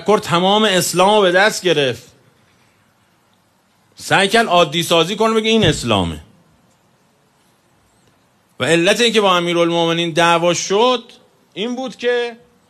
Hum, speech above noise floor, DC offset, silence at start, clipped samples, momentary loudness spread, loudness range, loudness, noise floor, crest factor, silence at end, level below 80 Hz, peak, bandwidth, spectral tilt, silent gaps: none; 43 dB; under 0.1%; 0 s; under 0.1%; 11 LU; 5 LU; -15 LUFS; -58 dBFS; 16 dB; 0.35 s; -48 dBFS; -2 dBFS; 13 kHz; -3.5 dB/octave; none